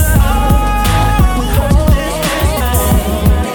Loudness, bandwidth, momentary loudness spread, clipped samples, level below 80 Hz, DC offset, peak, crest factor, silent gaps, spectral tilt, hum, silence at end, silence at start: -13 LUFS; 20 kHz; 3 LU; under 0.1%; -14 dBFS; under 0.1%; 0 dBFS; 10 dB; none; -5.5 dB/octave; none; 0 s; 0 s